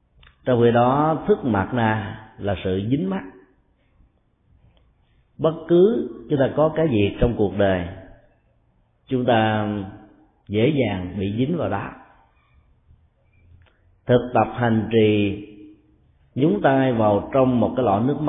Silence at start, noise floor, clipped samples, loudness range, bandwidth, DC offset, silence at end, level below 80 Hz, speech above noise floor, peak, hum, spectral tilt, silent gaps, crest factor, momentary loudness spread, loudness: 0.45 s; -62 dBFS; under 0.1%; 6 LU; 3.9 kHz; under 0.1%; 0 s; -44 dBFS; 42 dB; -4 dBFS; none; -12 dB/octave; none; 18 dB; 13 LU; -21 LUFS